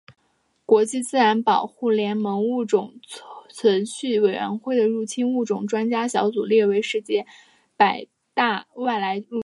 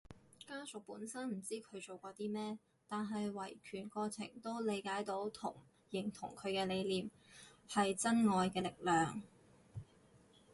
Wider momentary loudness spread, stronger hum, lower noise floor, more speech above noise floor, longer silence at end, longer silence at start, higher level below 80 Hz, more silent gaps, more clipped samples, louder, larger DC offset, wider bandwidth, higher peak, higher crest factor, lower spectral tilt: second, 9 LU vs 16 LU; neither; about the same, -68 dBFS vs -67 dBFS; first, 46 dB vs 27 dB; second, 0.05 s vs 0.35 s; about the same, 0.1 s vs 0.1 s; about the same, -76 dBFS vs -74 dBFS; neither; neither; first, -22 LUFS vs -40 LUFS; neither; about the same, 11.5 kHz vs 11.5 kHz; first, -4 dBFS vs -22 dBFS; about the same, 18 dB vs 20 dB; about the same, -4.5 dB/octave vs -4.5 dB/octave